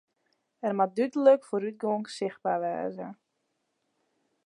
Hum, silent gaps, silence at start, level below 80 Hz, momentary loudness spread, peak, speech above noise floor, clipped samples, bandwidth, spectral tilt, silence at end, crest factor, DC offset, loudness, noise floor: none; none; 0.65 s; -84 dBFS; 13 LU; -8 dBFS; 51 dB; under 0.1%; 10.5 kHz; -6.5 dB/octave; 1.35 s; 22 dB; under 0.1%; -28 LUFS; -79 dBFS